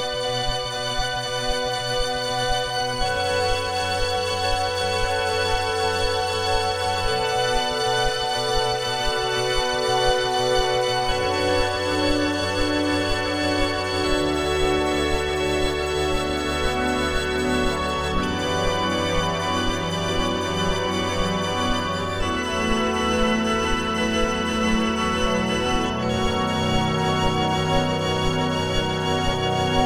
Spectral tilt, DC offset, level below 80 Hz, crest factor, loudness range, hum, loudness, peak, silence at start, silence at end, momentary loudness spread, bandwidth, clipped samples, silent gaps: -4 dB/octave; under 0.1%; -34 dBFS; 16 dB; 2 LU; none; -22 LUFS; -6 dBFS; 0 s; 0 s; 3 LU; 18 kHz; under 0.1%; none